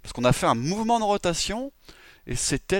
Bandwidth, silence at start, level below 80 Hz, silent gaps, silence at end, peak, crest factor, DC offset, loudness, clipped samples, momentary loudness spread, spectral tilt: 17 kHz; 0.05 s; -42 dBFS; none; 0 s; -6 dBFS; 18 dB; under 0.1%; -25 LUFS; under 0.1%; 11 LU; -4 dB/octave